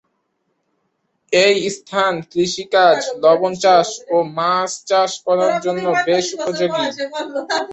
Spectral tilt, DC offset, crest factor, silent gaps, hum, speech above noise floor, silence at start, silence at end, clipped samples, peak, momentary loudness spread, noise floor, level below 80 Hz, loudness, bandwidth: -3.5 dB/octave; under 0.1%; 16 dB; none; none; 53 dB; 1.3 s; 0 s; under 0.1%; -2 dBFS; 8 LU; -69 dBFS; -64 dBFS; -17 LUFS; 8.4 kHz